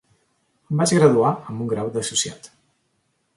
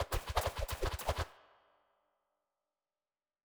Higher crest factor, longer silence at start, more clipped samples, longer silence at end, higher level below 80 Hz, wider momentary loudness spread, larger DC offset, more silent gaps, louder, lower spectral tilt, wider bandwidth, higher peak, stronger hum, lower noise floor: about the same, 20 dB vs 24 dB; first, 0.7 s vs 0 s; neither; second, 0.9 s vs 2.1 s; second, -60 dBFS vs -46 dBFS; first, 12 LU vs 4 LU; neither; neither; first, -20 LUFS vs -39 LUFS; about the same, -5 dB/octave vs -4 dB/octave; second, 11.5 kHz vs over 20 kHz; first, -2 dBFS vs -18 dBFS; neither; second, -69 dBFS vs under -90 dBFS